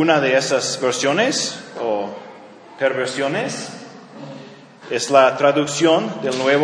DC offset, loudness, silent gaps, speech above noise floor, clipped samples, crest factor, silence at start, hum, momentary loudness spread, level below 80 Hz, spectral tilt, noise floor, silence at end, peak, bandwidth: under 0.1%; -18 LUFS; none; 23 dB; under 0.1%; 20 dB; 0 s; none; 21 LU; -72 dBFS; -3.5 dB/octave; -40 dBFS; 0 s; 0 dBFS; 10.5 kHz